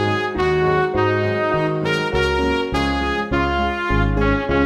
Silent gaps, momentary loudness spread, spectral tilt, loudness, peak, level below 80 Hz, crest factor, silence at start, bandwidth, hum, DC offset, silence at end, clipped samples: none; 2 LU; -6.5 dB/octave; -19 LUFS; -4 dBFS; -30 dBFS; 14 dB; 0 s; 12 kHz; none; under 0.1%; 0 s; under 0.1%